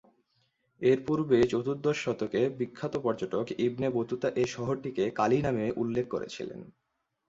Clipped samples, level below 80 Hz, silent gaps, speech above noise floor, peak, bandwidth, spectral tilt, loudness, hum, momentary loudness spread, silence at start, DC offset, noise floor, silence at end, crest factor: under 0.1%; -60 dBFS; none; 45 dB; -12 dBFS; 7.8 kHz; -6.5 dB/octave; -30 LUFS; none; 9 LU; 0.8 s; under 0.1%; -74 dBFS; 0.6 s; 18 dB